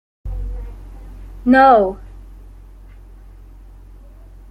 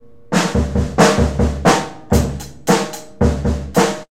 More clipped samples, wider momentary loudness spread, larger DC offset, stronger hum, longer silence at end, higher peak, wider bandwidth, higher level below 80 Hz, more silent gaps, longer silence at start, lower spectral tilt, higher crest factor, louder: neither; first, 29 LU vs 7 LU; second, under 0.1% vs 1%; first, 50 Hz at -50 dBFS vs none; first, 2.15 s vs 0.1 s; about the same, -2 dBFS vs 0 dBFS; second, 5.4 kHz vs 16.5 kHz; second, -34 dBFS vs -24 dBFS; neither; about the same, 0.25 s vs 0.3 s; first, -7.5 dB/octave vs -5 dB/octave; about the same, 18 dB vs 16 dB; first, -14 LUFS vs -17 LUFS